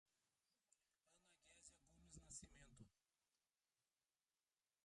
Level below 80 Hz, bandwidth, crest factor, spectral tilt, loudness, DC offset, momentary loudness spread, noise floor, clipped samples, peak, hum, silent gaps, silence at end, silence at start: -80 dBFS; 11 kHz; 26 dB; -2.5 dB/octave; -64 LUFS; under 0.1%; 9 LU; under -90 dBFS; under 0.1%; -46 dBFS; none; none; 1.85 s; 0.05 s